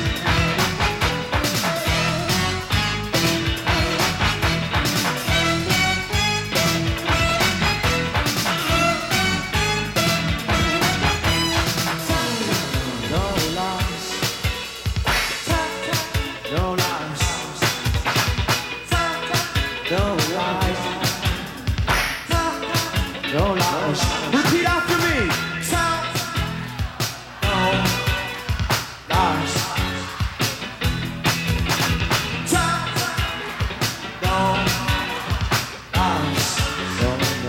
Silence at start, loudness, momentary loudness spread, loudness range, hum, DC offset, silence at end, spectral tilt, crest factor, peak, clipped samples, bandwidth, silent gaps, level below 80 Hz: 0 s; -21 LUFS; 6 LU; 3 LU; none; under 0.1%; 0 s; -3.5 dB/octave; 16 dB; -6 dBFS; under 0.1%; 17.5 kHz; none; -32 dBFS